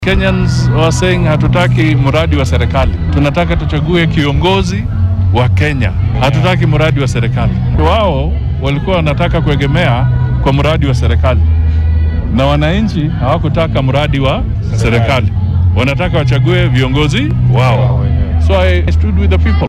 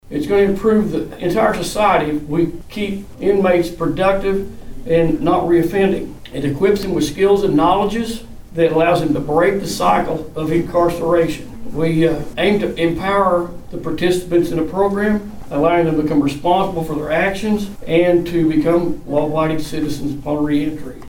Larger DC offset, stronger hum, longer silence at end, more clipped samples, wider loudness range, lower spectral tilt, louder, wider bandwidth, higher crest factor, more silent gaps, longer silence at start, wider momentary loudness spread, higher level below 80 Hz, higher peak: neither; neither; about the same, 0 s vs 0 s; neither; about the same, 1 LU vs 2 LU; about the same, -7 dB/octave vs -6.5 dB/octave; first, -11 LUFS vs -17 LUFS; second, 10.5 kHz vs 18 kHz; second, 8 dB vs 14 dB; neither; about the same, 0 s vs 0.05 s; second, 3 LU vs 9 LU; first, -18 dBFS vs -36 dBFS; about the same, -2 dBFS vs -2 dBFS